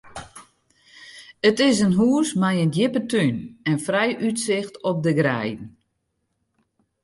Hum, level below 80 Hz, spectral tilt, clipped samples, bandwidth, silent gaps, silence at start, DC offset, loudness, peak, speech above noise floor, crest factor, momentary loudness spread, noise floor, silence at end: none; -60 dBFS; -5.5 dB/octave; under 0.1%; 11.5 kHz; none; 0.05 s; under 0.1%; -21 LUFS; -6 dBFS; 54 dB; 18 dB; 19 LU; -74 dBFS; 1.35 s